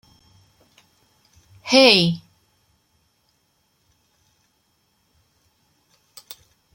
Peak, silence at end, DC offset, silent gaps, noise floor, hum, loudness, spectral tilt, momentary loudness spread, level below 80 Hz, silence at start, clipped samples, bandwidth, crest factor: 0 dBFS; 4.6 s; under 0.1%; none; -67 dBFS; none; -15 LUFS; -4 dB/octave; 30 LU; -66 dBFS; 1.65 s; under 0.1%; 16.5 kHz; 26 dB